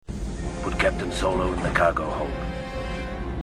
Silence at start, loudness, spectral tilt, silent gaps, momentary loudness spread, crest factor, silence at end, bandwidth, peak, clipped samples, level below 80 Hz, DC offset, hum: 0.1 s; -26 LUFS; -5.5 dB/octave; none; 10 LU; 20 dB; 0 s; 12.5 kHz; -6 dBFS; under 0.1%; -34 dBFS; 0.2%; none